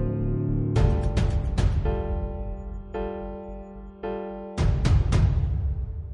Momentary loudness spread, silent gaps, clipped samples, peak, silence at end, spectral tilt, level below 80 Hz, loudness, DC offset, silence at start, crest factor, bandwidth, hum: 14 LU; none; under 0.1%; -8 dBFS; 0 s; -8 dB/octave; -28 dBFS; -27 LUFS; under 0.1%; 0 s; 18 dB; 10.5 kHz; none